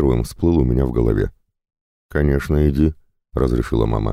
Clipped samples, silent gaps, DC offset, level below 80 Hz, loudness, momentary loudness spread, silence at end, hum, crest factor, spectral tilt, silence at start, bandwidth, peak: under 0.1%; 1.81-2.09 s; under 0.1%; -26 dBFS; -19 LUFS; 5 LU; 0 s; none; 14 dB; -8.5 dB/octave; 0 s; 15 kHz; -4 dBFS